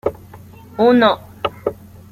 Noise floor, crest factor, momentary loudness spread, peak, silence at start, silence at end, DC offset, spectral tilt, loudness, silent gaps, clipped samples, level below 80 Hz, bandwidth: -39 dBFS; 16 dB; 14 LU; -2 dBFS; 0.05 s; 0.4 s; under 0.1%; -6.5 dB/octave; -17 LUFS; none; under 0.1%; -50 dBFS; 15 kHz